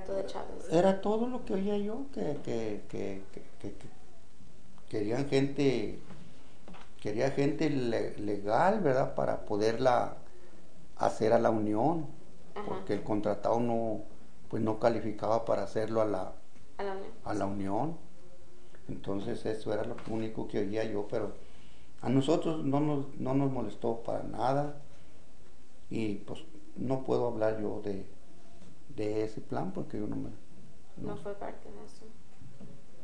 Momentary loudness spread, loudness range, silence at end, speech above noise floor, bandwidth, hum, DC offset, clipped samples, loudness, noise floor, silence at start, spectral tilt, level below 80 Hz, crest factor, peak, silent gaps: 19 LU; 8 LU; 0 s; 26 dB; 10 kHz; none; 2%; under 0.1%; -33 LUFS; -58 dBFS; 0 s; -7 dB/octave; -56 dBFS; 22 dB; -12 dBFS; none